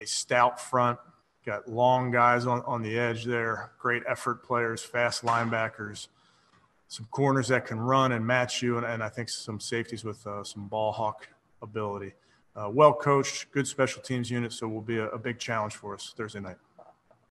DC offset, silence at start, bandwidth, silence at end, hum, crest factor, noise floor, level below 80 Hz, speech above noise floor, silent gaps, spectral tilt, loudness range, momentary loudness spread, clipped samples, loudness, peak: under 0.1%; 0 s; 12.5 kHz; 0.5 s; none; 24 dB; -65 dBFS; -70 dBFS; 36 dB; none; -4.5 dB/octave; 7 LU; 16 LU; under 0.1%; -28 LUFS; -6 dBFS